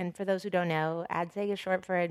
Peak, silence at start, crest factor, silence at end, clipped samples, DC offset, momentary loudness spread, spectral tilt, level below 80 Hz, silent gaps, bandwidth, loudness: -16 dBFS; 0 s; 16 dB; 0 s; under 0.1%; under 0.1%; 4 LU; -6.5 dB/octave; -74 dBFS; none; 14 kHz; -31 LUFS